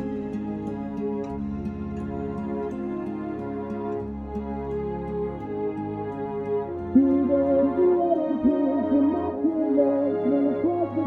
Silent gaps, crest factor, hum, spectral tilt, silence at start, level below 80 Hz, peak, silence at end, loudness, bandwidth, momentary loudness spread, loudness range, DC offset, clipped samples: none; 18 dB; none; -10.5 dB/octave; 0 s; -46 dBFS; -8 dBFS; 0 s; -26 LUFS; 4.2 kHz; 10 LU; 9 LU; under 0.1%; under 0.1%